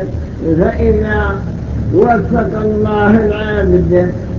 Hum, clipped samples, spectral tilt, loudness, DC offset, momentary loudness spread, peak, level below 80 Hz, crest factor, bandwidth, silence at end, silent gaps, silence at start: none; under 0.1%; -9.5 dB/octave; -13 LUFS; under 0.1%; 9 LU; 0 dBFS; -22 dBFS; 12 dB; 7 kHz; 0 s; none; 0 s